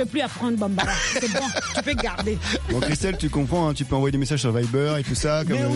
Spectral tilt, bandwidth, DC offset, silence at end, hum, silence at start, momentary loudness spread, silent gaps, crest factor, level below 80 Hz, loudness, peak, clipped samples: -5 dB/octave; 11.5 kHz; under 0.1%; 0 s; none; 0 s; 3 LU; none; 18 dB; -36 dBFS; -23 LUFS; -6 dBFS; under 0.1%